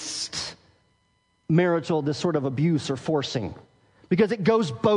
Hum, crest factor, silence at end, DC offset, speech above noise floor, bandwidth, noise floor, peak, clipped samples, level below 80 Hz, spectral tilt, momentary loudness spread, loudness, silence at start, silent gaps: none; 18 dB; 0 s; under 0.1%; 45 dB; 10.5 kHz; -68 dBFS; -8 dBFS; under 0.1%; -62 dBFS; -6 dB/octave; 10 LU; -25 LUFS; 0 s; none